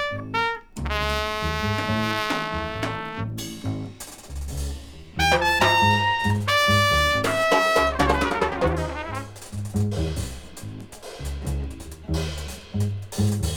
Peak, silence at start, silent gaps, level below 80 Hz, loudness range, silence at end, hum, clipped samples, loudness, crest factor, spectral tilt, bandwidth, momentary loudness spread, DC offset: -4 dBFS; 0 s; none; -36 dBFS; 11 LU; 0 s; none; under 0.1%; -23 LUFS; 20 dB; -4.5 dB/octave; 20 kHz; 17 LU; under 0.1%